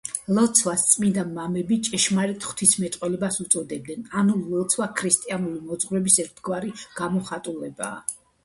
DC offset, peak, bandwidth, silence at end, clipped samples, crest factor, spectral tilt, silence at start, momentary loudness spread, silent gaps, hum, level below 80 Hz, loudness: under 0.1%; -2 dBFS; 12 kHz; 0.3 s; under 0.1%; 22 dB; -3.5 dB/octave; 0.05 s; 13 LU; none; none; -62 dBFS; -23 LUFS